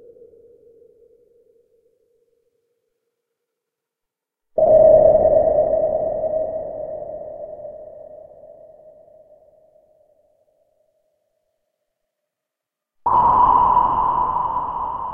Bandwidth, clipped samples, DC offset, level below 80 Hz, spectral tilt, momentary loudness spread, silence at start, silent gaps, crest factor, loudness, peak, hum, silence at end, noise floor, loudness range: 3.3 kHz; under 0.1%; under 0.1%; -46 dBFS; -10 dB/octave; 22 LU; 4.55 s; none; 20 dB; -17 LUFS; -2 dBFS; none; 0 s; -84 dBFS; 19 LU